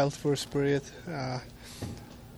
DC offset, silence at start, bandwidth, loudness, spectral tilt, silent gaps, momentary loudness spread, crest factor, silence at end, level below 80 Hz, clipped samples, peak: under 0.1%; 0 s; over 20 kHz; -33 LUFS; -5.5 dB/octave; none; 14 LU; 18 dB; 0 s; -54 dBFS; under 0.1%; -14 dBFS